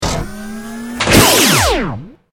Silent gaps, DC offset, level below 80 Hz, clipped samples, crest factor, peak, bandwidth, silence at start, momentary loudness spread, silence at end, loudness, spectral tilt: none; under 0.1%; -28 dBFS; under 0.1%; 14 dB; 0 dBFS; over 20 kHz; 0 s; 19 LU; 0.2 s; -11 LUFS; -3 dB/octave